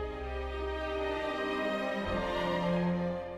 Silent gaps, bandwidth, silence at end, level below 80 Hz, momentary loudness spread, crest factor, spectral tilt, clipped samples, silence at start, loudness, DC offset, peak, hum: none; 12 kHz; 0 s; -46 dBFS; 6 LU; 14 dB; -6.5 dB/octave; under 0.1%; 0 s; -33 LUFS; under 0.1%; -20 dBFS; none